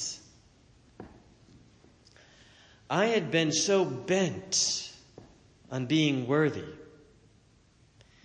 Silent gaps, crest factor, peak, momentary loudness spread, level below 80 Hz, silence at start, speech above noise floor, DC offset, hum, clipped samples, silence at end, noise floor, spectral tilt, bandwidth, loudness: none; 18 dB; -14 dBFS; 24 LU; -66 dBFS; 0 s; 35 dB; under 0.1%; none; under 0.1%; 1.4 s; -62 dBFS; -3.5 dB/octave; 10 kHz; -28 LUFS